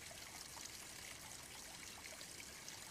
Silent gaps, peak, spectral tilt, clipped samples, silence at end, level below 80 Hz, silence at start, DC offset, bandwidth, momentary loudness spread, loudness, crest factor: none; -34 dBFS; -1 dB/octave; under 0.1%; 0 s; -72 dBFS; 0 s; under 0.1%; 15 kHz; 1 LU; -51 LUFS; 20 dB